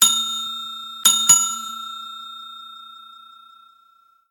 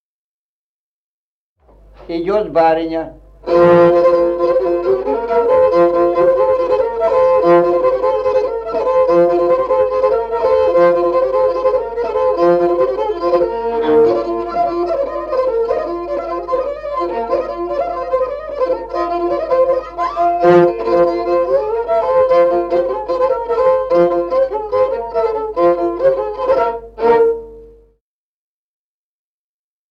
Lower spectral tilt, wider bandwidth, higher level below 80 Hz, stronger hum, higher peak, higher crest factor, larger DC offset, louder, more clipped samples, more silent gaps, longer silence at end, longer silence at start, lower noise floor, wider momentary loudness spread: second, 2.5 dB/octave vs -8 dB/octave; first, 17.5 kHz vs 6 kHz; second, -70 dBFS vs -44 dBFS; neither; about the same, 0 dBFS vs -2 dBFS; first, 22 dB vs 14 dB; neither; about the same, -17 LUFS vs -15 LUFS; neither; neither; second, 1.1 s vs 2.25 s; second, 0 s vs 2 s; second, -57 dBFS vs under -90 dBFS; first, 24 LU vs 8 LU